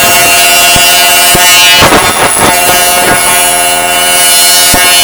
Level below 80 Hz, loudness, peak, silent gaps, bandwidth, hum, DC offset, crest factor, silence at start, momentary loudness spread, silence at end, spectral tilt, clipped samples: -30 dBFS; -2 LUFS; 0 dBFS; none; over 20 kHz; none; under 0.1%; 4 dB; 0 s; 4 LU; 0 s; -0.5 dB/octave; 7%